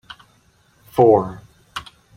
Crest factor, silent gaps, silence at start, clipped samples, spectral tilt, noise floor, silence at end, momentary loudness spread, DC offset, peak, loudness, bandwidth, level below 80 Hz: 18 dB; none; 0.95 s; under 0.1%; -7.5 dB/octave; -57 dBFS; 0.35 s; 19 LU; under 0.1%; -2 dBFS; -16 LUFS; 16 kHz; -54 dBFS